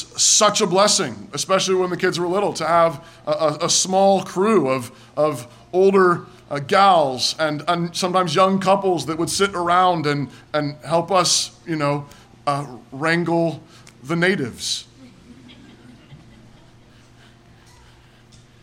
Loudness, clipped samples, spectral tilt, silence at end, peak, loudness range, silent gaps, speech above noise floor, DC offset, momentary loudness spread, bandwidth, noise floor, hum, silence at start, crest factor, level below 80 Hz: -19 LUFS; under 0.1%; -3.5 dB/octave; 2.45 s; -4 dBFS; 7 LU; none; 30 dB; under 0.1%; 11 LU; 16.5 kHz; -49 dBFS; none; 0 s; 16 dB; -58 dBFS